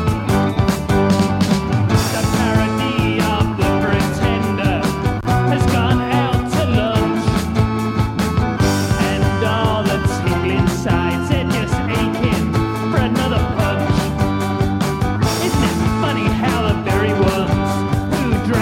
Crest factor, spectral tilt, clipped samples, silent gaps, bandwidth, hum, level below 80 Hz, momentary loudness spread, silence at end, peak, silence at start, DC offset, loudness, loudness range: 14 dB; -6 dB/octave; under 0.1%; none; 17 kHz; none; -30 dBFS; 3 LU; 0 s; -4 dBFS; 0 s; under 0.1%; -17 LUFS; 1 LU